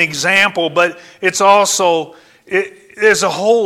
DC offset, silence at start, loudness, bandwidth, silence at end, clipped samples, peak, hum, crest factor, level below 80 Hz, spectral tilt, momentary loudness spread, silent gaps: under 0.1%; 0 s; -13 LUFS; 16.5 kHz; 0 s; under 0.1%; 0 dBFS; none; 14 dB; -58 dBFS; -2 dB/octave; 9 LU; none